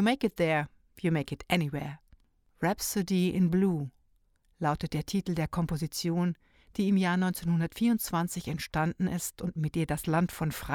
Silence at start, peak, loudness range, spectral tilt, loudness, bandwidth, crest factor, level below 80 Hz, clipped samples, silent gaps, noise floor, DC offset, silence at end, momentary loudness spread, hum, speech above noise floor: 0 s; -12 dBFS; 2 LU; -5.5 dB/octave; -30 LUFS; 18.5 kHz; 18 dB; -52 dBFS; under 0.1%; none; -68 dBFS; under 0.1%; 0 s; 8 LU; none; 39 dB